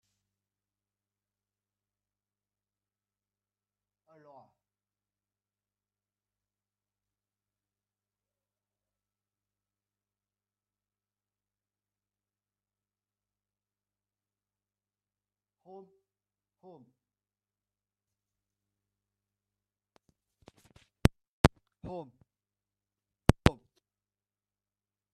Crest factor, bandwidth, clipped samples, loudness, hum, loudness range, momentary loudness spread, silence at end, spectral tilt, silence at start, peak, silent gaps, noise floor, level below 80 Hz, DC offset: 40 dB; 8.2 kHz; under 0.1%; -29 LUFS; 50 Hz at -65 dBFS; 3 LU; 27 LU; 1.6 s; -6.5 dB/octave; 21.45 s; 0 dBFS; none; under -90 dBFS; -50 dBFS; under 0.1%